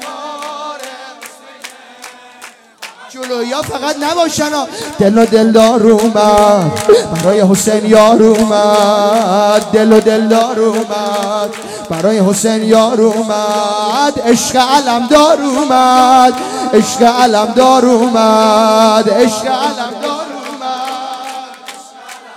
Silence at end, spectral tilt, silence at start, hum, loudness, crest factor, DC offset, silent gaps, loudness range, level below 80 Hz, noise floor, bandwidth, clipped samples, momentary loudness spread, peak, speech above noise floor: 0 s; -4.5 dB/octave; 0 s; none; -10 LUFS; 10 dB; under 0.1%; none; 9 LU; -48 dBFS; -36 dBFS; 16.5 kHz; 1%; 17 LU; 0 dBFS; 27 dB